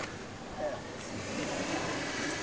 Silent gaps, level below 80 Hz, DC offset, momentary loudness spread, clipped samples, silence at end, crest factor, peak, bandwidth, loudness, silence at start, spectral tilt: none; -56 dBFS; 0.1%; 7 LU; under 0.1%; 0 s; 16 dB; -22 dBFS; 8 kHz; -36 LUFS; 0 s; -3.5 dB/octave